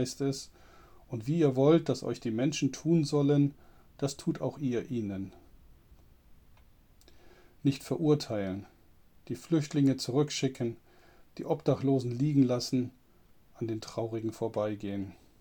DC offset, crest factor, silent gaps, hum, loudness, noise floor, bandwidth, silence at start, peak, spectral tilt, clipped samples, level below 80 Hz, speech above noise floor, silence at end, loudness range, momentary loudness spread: under 0.1%; 20 dB; none; none; -31 LUFS; -61 dBFS; 19 kHz; 0 s; -12 dBFS; -6.5 dB/octave; under 0.1%; -62 dBFS; 31 dB; 0.25 s; 9 LU; 14 LU